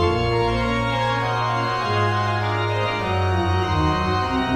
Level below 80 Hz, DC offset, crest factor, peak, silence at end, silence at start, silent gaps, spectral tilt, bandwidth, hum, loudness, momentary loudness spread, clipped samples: -36 dBFS; under 0.1%; 14 dB; -8 dBFS; 0 s; 0 s; none; -6.5 dB/octave; 11 kHz; none; -21 LUFS; 2 LU; under 0.1%